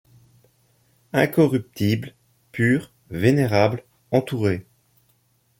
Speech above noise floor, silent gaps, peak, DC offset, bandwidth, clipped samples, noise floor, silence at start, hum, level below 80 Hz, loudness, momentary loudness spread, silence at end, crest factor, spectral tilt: 44 dB; none; -4 dBFS; under 0.1%; 17 kHz; under 0.1%; -64 dBFS; 1.15 s; none; -58 dBFS; -22 LUFS; 14 LU; 1 s; 20 dB; -7 dB/octave